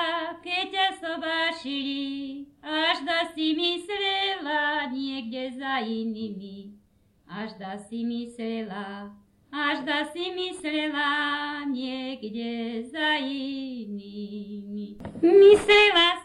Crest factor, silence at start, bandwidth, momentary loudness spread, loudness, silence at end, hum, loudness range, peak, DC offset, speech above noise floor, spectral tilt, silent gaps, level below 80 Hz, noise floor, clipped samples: 20 dB; 0 s; 11.5 kHz; 18 LU; -25 LUFS; 0 s; none; 10 LU; -6 dBFS; under 0.1%; 37 dB; -4 dB/octave; none; -60 dBFS; -62 dBFS; under 0.1%